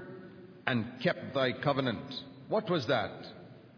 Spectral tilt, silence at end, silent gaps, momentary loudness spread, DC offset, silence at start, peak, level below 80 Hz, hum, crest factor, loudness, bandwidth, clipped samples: -4 dB/octave; 0.05 s; none; 18 LU; under 0.1%; 0 s; -10 dBFS; -72 dBFS; none; 24 dB; -33 LUFS; 5.4 kHz; under 0.1%